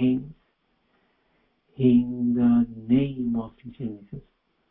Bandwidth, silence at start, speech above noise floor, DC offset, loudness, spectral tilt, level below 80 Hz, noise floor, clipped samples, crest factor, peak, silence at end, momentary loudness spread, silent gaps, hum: 3.7 kHz; 0 s; 46 dB; under 0.1%; -24 LUFS; -12.5 dB/octave; -54 dBFS; -70 dBFS; under 0.1%; 16 dB; -10 dBFS; 0.5 s; 21 LU; none; none